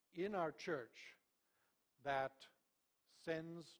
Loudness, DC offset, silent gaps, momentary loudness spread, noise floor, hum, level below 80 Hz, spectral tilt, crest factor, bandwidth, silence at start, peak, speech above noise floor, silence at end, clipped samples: -46 LUFS; under 0.1%; none; 18 LU; -85 dBFS; none; -82 dBFS; -5.5 dB/octave; 20 dB; over 20 kHz; 0.15 s; -28 dBFS; 39 dB; 0.05 s; under 0.1%